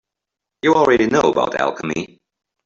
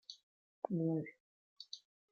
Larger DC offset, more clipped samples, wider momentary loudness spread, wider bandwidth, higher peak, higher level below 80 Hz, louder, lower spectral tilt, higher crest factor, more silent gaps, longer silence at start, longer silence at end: neither; neither; second, 12 LU vs 19 LU; about the same, 7.6 kHz vs 7 kHz; first, -2 dBFS vs -22 dBFS; first, -54 dBFS vs -88 dBFS; first, -17 LUFS vs -42 LUFS; second, -5 dB/octave vs -7 dB/octave; second, 16 dB vs 22 dB; second, none vs 0.23-0.62 s, 1.20-1.56 s; first, 0.65 s vs 0.1 s; first, 0.6 s vs 0.35 s